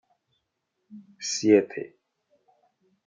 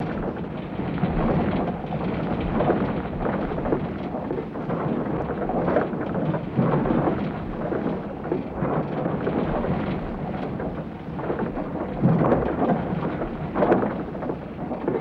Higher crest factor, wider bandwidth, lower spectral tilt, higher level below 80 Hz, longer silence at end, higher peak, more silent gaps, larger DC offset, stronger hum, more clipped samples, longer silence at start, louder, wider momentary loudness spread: first, 24 dB vs 18 dB; first, 9.4 kHz vs 5.4 kHz; second, -4 dB/octave vs -10.5 dB/octave; second, -80 dBFS vs -40 dBFS; first, 1.2 s vs 0 s; about the same, -6 dBFS vs -8 dBFS; neither; neither; neither; neither; first, 0.9 s vs 0 s; about the same, -24 LUFS vs -26 LUFS; first, 18 LU vs 8 LU